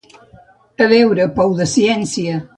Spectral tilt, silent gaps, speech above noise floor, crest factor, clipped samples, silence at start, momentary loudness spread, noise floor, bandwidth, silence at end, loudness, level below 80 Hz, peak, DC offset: -5 dB/octave; none; 33 dB; 16 dB; under 0.1%; 0.8 s; 8 LU; -47 dBFS; 11 kHz; 0.1 s; -14 LUFS; -48 dBFS; 0 dBFS; under 0.1%